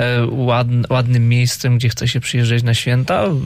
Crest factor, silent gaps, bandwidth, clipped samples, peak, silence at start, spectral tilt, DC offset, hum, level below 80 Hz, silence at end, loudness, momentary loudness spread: 10 dB; none; 15.5 kHz; under 0.1%; -6 dBFS; 0 s; -5.5 dB/octave; under 0.1%; none; -44 dBFS; 0 s; -16 LUFS; 3 LU